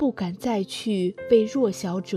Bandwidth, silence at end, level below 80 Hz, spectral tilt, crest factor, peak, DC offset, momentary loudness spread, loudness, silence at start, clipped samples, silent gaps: 14 kHz; 0 s; -62 dBFS; -6 dB/octave; 16 dB; -6 dBFS; under 0.1%; 7 LU; -24 LUFS; 0 s; under 0.1%; none